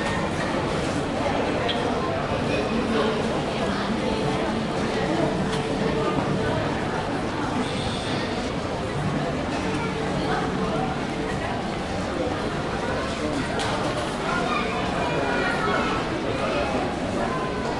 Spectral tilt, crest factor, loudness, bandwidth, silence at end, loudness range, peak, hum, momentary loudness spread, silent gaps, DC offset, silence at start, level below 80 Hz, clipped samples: -5.5 dB/octave; 16 dB; -25 LUFS; 11.5 kHz; 0 s; 2 LU; -10 dBFS; none; 3 LU; none; under 0.1%; 0 s; -42 dBFS; under 0.1%